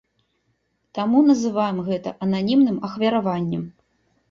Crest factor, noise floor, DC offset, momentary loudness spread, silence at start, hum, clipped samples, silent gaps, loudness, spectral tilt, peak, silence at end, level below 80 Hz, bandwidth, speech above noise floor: 16 dB; -70 dBFS; under 0.1%; 10 LU; 0.95 s; none; under 0.1%; none; -21 LUFS; -7 dB/octave; -6 dBFS; 0.6 s; -62 dBFS; 7.4 kHz; 50 dB